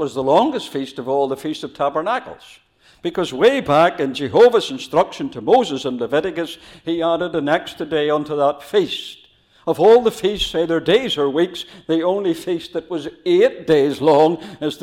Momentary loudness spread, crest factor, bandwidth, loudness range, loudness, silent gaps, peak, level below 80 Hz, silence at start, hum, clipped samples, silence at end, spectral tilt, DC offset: 12 LU; 16 dB; 15 kHz; 4 LU; -18 LUFS; none; -4 dBFS; -50 dBFS; 0 s; none; under 0.1%; 0 s; -5.5 dB/octave; under 0.1%